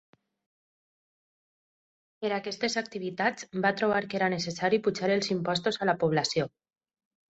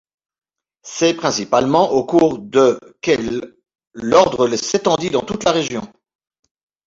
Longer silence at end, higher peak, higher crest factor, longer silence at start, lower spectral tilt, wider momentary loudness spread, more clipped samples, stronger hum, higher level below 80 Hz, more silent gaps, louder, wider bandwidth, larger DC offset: about the same, 0.9 s vs 1 s; second, -12 dBFS vs 0 dBFS; about the same, 20 dB vs 18 dB; first, 2.2 s vs 0.85 s; about the same, -4.5 dB/octave vs -4.5 dB/octave; second, 6 LU vs 11 LU; neither; neither; second, -68 dBFS vs -52 dBFS; neither; second, -29 LUFS vs -17 LUFS; about the same, 8.2 kHz vs 7.8 kHz; neither